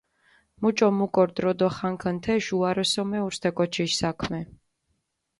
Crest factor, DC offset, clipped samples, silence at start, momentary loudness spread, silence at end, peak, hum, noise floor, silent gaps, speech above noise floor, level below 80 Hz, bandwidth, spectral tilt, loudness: 18 dB; under 0.1%; under 0.1%; 0.6 s; 6 LU; 0.95 s; -8 dBFS; none; -75 dBFS; none; 51 dB; -56 dBFS; 11.5 kHz; -5 dB/octave; -25 LUFS